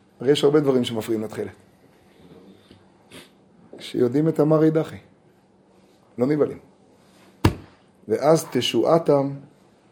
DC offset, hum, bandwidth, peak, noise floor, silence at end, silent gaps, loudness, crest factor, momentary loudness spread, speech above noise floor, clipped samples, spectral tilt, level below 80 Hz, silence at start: under 0.1%; none; 19 kHz; -2 dBFS; -57 dBFS; 0.5 s; none; -21 LUFS; 20 dB; 18 LU; 36 dB; under 0.1%; -6 dB/octave; -50 dBFS; 0.2 s